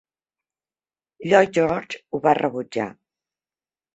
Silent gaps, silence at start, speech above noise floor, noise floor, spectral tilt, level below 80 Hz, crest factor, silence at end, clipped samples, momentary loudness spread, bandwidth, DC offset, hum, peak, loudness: none; 1.2 s; over 69 dB; under -90 dBFS; -5.5 dB/octave; -62 dBFS; 22 dB; 1.05 s; under 0.1%; 13 LU; 8.2 kHz; under 0.1%; none; -2 dBFS; -21 LUFS